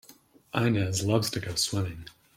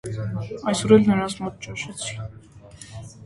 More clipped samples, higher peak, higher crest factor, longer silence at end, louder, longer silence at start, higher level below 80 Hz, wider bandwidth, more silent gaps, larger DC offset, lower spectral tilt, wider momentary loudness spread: neither; second, -10 dBFS vs -2 dBFS; about the same, 20 dB vs 22 dB; first, 0.25 s vs 0 s; second, -28 LUFS vs -23 LUFS; about the same, 0.1 s vs 0.05 s; second, -58 dBFS vs -50 dBFS; first, 16.5 kHz vs 11.5 kHz; neither; neither; about the same, -4.5 dB/octave vs -5.5 dB/octave; second, 8 LU vs 23 LU